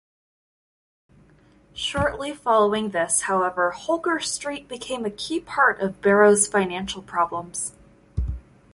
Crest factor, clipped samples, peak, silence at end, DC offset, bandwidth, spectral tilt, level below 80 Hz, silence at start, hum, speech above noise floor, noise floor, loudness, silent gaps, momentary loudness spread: 18 dB; under 0.1%; -6 dBFS; 0.35 s; under 0.1%; 11.5 kHz; -3 dB/octave; -42 dBFS; 1.75 s; none; 33 dB; -55 dBFS; -23 LUFS; none; 14 LU